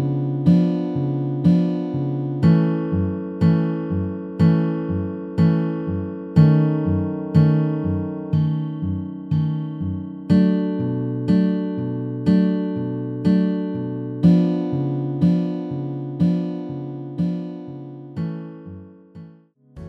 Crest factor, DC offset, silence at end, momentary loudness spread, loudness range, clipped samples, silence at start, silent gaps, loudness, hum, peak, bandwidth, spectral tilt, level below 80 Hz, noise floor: 18 dB; under 0.1%; 0 s; 12 LU; 5 LU; under 0.1%; 0 s; none; -21 LUFS; none; -2 dBFS; 5 kHz; -10.5 dB/octave; -52 dBFS; -49 dBFS